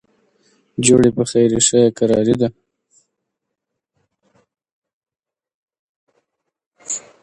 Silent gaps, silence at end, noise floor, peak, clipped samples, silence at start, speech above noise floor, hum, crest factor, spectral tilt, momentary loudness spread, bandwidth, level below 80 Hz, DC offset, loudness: 4.72-4.82 s, 4.93-5.02 s, 5.54-5.68 s, 5.79-6.07 s, 6.66-6.71 s; 0.25 s; -79 dBFS; 0 dBFS; under 0.1%; 0.8 s; 65 dB; none; 20 dB; -4.5 dB/octave; 14 LU; 11.5 kHz; -52 dBFS; under 0.1%; -15 LUFS